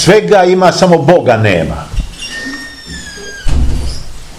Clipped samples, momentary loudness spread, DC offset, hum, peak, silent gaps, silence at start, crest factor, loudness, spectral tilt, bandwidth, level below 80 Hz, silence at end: 2%; 18 LU; under 0.1%; none; 0 dBFS; none; 0 s; 10 dB; -10 LUFS; -5.5 dB/octave; 15.5 kHz; -20 dBFS; 0 s